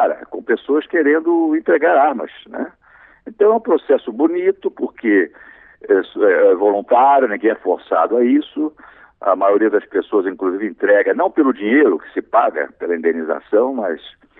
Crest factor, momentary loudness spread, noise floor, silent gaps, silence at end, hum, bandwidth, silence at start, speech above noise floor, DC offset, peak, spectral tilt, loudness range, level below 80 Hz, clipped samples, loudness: 14 dB; 11 LU; -48 dBFS; none; 0.3 s; none; 4 kHz; 0 s; 32 dB; under 0.1%; -2 dBFS; -9.5 dB/octave; 2 LU; -64 dBFS; under 0.1%; -16 LUFS